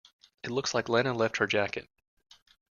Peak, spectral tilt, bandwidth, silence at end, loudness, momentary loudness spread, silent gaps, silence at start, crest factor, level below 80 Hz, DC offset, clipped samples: -10 dBFS; -4 dB/octave; 7.4 kHz; 1 s; -29 LUFS; 10 LU; none; 0.45 s; 22 dB; -68 dBFS; under 0.1%; under 0.1%